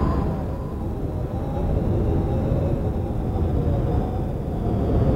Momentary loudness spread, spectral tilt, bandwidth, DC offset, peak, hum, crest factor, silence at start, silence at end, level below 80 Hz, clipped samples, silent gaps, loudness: 5 LU; -10 dB/octave; 7.6 kHz; under 0.1%; -8 dBFS; none; 14 dB; 0 s; 0 s; -28 dBFS; under 0.1%; none; -25 LUFS